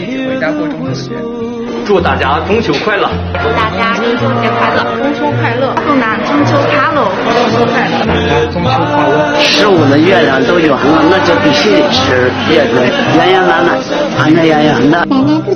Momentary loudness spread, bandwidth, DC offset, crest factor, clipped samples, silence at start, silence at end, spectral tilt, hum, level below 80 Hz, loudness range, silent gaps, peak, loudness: 7 LU; 7 kHz; under 0.1%; 10 dB; 0.3%; 0 s; 0 s; -5.5 dB/octave; none; -36 dBFS; 4 LU; none; 0 dBFS; -10 LUFS